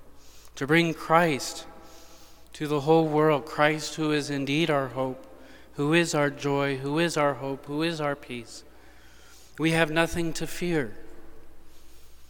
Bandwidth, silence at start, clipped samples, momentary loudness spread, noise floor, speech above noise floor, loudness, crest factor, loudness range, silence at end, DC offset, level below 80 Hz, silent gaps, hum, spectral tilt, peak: 18.5 kHz; 0.05 s; under 0.1%; 15 LU; -52 dBFS; 27 dB; -26 LUFS; 22 dB; 4 LU; 0 s; 0.3%; -50 dBFS; none; none; -5 dB/octave; -4 dBFS